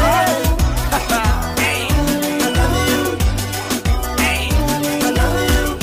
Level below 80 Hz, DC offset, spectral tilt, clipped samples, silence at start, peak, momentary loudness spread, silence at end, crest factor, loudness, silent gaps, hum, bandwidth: -22 dBFS; under 0.1%; -4.5 dB/octave; under 0.1%; 0 s; -6 dBFS; 3 LU; 0 s; 12 dB; -17 LUFS; none; none; 16 kHz